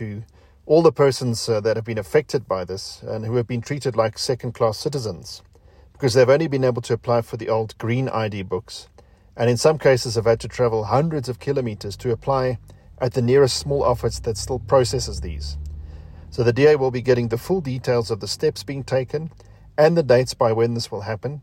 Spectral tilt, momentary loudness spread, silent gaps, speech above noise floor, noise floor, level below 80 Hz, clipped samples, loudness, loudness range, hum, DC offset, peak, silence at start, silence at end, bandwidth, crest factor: -5.5 dB/octave; 14 LU; none; 29 dB; -50 dBFS; -42 dBFS; under 0.1%; -21 LUFS; 3 LU; none; under 0.1%; -4 dBFS; 0 s; 0 s; 16.5 kHz; 18 dB